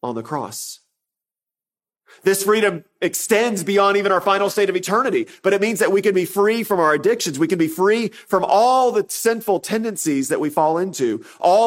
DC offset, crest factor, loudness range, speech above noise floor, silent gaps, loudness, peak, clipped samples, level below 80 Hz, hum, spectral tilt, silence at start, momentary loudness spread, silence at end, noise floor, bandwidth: under 0.1%; 16 dB; 3 LU; over 72 dB; none; -19 LUFS; -2 dBFS; under 0.1%; -70 dBFS; none; -4 dB/octave; 0.05 s; 7 LU; 0 s; under -90 dBFS; 16.5 kHz